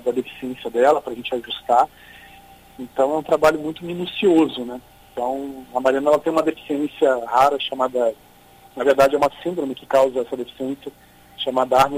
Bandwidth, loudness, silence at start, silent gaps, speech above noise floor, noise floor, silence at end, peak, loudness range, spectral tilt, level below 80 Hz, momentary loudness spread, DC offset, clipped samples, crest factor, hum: 16 kHz; -20 LUFS; 0.05 s; none; 29 dB; -49 dBFS; 0 s; -4 dBFS; 2 LU; -5 dB/octave; -54 dBFS; 13 LU; under 0.1%; under 0.1%; 16 dB; none